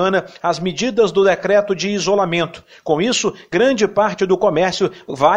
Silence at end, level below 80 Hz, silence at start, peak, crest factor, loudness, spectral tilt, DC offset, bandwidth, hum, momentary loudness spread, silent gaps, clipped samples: 0 s; -52 dBFS; 0 s; -2 dBFS; 16 dB; -17 LUFS; -4.5 dB/octave; under 0.1%; 9.6 kHz; none; 7 LU; none; under 0.1%